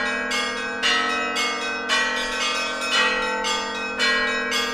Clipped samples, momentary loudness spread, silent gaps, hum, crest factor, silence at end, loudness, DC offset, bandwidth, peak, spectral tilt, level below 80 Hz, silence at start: under 0.1%; 4 LU; none; none; 18 dB; 0 s; -21 LUFS; under 0.1%; 15.5 kHz; -6 dBFS; -0.5 dB/octave; -52 dBFS; 0 s